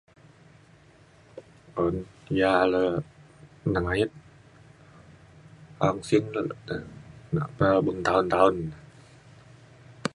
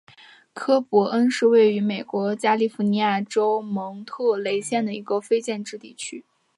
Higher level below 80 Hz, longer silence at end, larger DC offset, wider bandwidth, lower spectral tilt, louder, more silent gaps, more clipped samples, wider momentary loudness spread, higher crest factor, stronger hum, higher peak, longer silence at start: first, -52 dBFS vs -76 dBFS; second, 0.05 s vs 0.35 s; neither; about the same, 11.5 kHz vs 11.5 kHz; first, -6.5 dB/octave vs -5 dB/octave; second, -26 LUFS vs -22 LUFS; neither; neither; first, 22 LU vs 16 LU; first, 24 dB vs 16 dB; neither; about the same, -4 dBFS vs -6 dBFS; first, 1.35 s vs 0.55 s